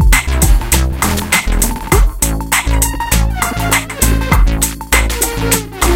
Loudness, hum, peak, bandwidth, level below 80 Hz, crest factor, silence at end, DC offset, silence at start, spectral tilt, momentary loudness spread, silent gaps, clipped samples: -13 LUFS; none; 0 dBFS; 17.5 kHz; -14 dBFS; 12 dB; 0 s; under 0.1%; 0 s; -3.5 dB/octave; 4 LU; none; 0.1%